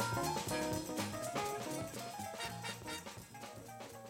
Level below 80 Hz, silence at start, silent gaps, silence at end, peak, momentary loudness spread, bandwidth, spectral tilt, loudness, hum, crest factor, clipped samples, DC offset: -64 dBFS; 0 s; none; 0 s; -24 dBFS; 13 LU; 16.5 kHz; -4 dB/octave; -41 LUFS; none; 18 dB; under 0.1%; under 0.1%